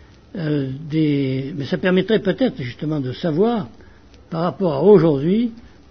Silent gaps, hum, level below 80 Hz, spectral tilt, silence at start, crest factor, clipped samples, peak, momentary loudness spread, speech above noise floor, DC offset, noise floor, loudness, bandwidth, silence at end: none; none; -52 dBFS; -9 dB/octave; 0.35 s; 18 dB; under 0.1%; -2 dBFS; 13 LU; 28 dB; 0.3%; -46 dBFS; -19 LUFS; 6.4 kHz; 0.25 s